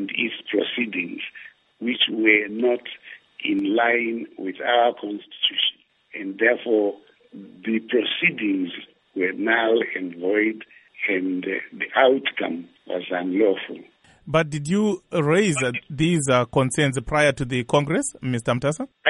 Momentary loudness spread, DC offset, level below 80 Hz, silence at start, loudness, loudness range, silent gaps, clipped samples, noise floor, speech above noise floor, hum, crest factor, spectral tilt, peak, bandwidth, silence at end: 14 LU; under 0.1%; -52 dBFS; 0 s; -22 LUFS; 3 LU; none; under 0.1%; -46 dBFS; 24 dB; none; 20 dB; -4.5 dB/octave; -2 dBFS; 11.5 kHz; 0 s